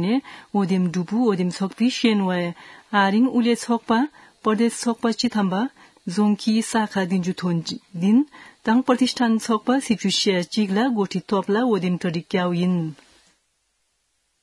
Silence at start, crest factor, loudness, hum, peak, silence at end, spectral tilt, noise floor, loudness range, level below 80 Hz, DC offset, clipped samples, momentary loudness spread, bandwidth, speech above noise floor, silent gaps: 0 s; 18 dB; -22 LUFS; none; -4 dBFS; 1.5 s; -5.5 dB/octave; -70 dBFS; 2 LU; -68 dBFS; under 0.1%; under 0.1%; 7 LU; 12 kHz; 49 dB; none